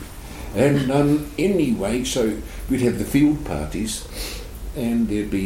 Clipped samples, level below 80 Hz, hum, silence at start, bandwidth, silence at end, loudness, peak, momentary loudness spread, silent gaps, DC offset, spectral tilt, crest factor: under 0.1%; -36 dBFS; none; 0 s; 17 kHz; 0 s; -22 LUFS; -6 dBFS; 13 LU; none; under 0.1%; -5.5 dB/octave; 16 dB